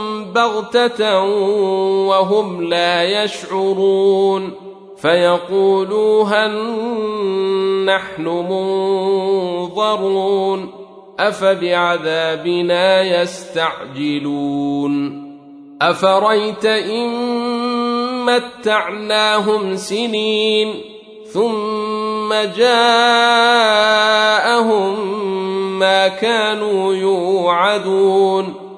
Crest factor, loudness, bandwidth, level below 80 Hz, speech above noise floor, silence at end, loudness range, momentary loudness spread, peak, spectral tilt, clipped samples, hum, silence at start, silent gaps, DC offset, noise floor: 14 dB; -16 LUFS; 11 kHz; -64 dBFS; 22 dB; 0 s; 5 LU; 8 LU; 0 dBFS; -4 dB/octave; under 0.1%; none; 0 s; none; under 0.1%; -38 dBFS